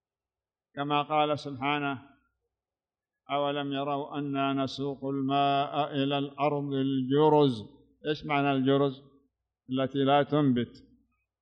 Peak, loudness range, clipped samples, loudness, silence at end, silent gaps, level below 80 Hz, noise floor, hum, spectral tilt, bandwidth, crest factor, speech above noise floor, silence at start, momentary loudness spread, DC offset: -12 dBFS; 5 LU; under 0.1%; -28 LUFS; 0.65 s; none; -70 dBFS; under -90 dBFS; none; -7.5 dB/octave; 6.8 kHz; 18 dB; over 62 dB; 0.75 s; 10 LU; under 0.1%